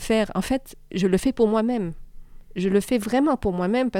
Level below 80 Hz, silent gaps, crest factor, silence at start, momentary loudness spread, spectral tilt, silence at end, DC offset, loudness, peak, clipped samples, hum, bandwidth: -42 dBFS; none; 16 dB; 0 s; 8 LU; -6 dB/octave; 0 s; under 0.1%; -23 LUFS; -6 dBFS; under 0.1%; none; 16.5 kHz